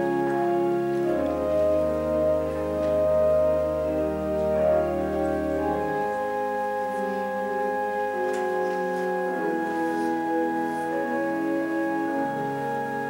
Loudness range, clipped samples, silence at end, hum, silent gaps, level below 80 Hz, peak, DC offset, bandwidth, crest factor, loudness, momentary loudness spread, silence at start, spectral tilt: 3 LU; under 0.1%; 0 s; none; none; -48 dBFS; -12 dBFS; under 0.1%; 16 kHz; 14 dB; -25 LUFS; 5 LU; 0 s; -7 dB/octave